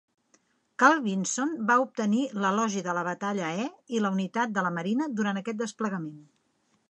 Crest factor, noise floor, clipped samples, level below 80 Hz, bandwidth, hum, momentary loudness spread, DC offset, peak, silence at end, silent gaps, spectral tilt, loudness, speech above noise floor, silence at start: 22 dB; -71 dBFS; under 0.1%; -80 dBFS; 10 kHz; none; 10 LU; under 0.1%; -6 dBFS; 0.7 s; none; -4.5 dB/octave; -27 LUFS; 44 dB; 0.8 s